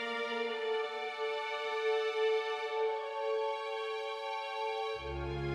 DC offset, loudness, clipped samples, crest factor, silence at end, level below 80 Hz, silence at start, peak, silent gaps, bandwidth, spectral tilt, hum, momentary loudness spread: under 0.1%; -36 LUFS; under 0.1%; 14 dB; 0 s; -56 dBFS; 0 s; -22 dBFS; none; 10 kHz; -4.5 dB/octave; none; 6 LU